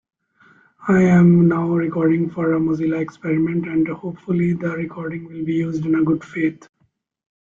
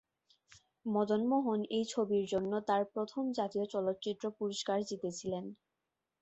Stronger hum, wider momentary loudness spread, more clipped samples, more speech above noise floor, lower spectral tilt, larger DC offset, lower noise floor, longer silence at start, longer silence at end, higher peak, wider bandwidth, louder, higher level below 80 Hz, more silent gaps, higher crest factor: neither; first, 14 LU vs 8 LU; neither; second, 48 dB vs 53 dB; first, -9.5 dB/octave vs -5.5 dB/octave; neither; second, -66 dBFS vs -88 dBFS; about the same, 0.8 s vs 0.85 s; first, 0.95 s vs 0.65 s; first, -4 dBFS vs -20 dBFS; second, 7.4 kHz vs 8.2 kHz; first, -19 LUFS vs -35 LUFS; first, -54 dBFS vs -76 dBFS; neither; about the same, 14 dB vs 16 dB